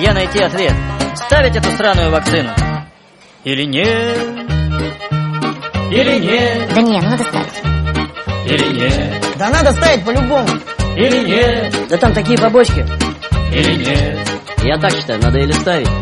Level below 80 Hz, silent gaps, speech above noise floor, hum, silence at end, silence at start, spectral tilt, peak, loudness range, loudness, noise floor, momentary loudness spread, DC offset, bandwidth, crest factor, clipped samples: -24 dBFS; none; 31 dB; none; 0 s; 0 s; -5.5 dB/octave; 0 dBFS; 3 LU; -14 LUFS; -44 dBFS; 8 LU; under 0.1%; 11.5 kHz; 14 dB; under 0.1%